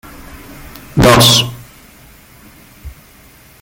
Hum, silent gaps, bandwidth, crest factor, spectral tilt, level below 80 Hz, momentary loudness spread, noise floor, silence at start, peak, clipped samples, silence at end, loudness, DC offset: none; none; 17.5 kHz; 16 dB; -3.5 dB/octave; -34 dBFS; 28 LU; -43 dBFS; 0.35 s; 0 dBFS; under 0.1%; 0.75 s; -9 LUFS; under 0.1%